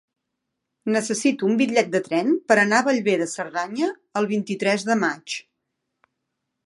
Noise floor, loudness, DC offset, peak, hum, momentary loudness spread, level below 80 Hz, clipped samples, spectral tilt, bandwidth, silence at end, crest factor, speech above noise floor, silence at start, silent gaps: -80 dBFS; -22 LUFS; under 0.1%; -2 dBFS; none; 9 LU; -76 dBFS; under 0.1%; -4 dB/octave; 11.5 kHz; 1.25 s; 22 dB; 59 dB; 0.85 s; none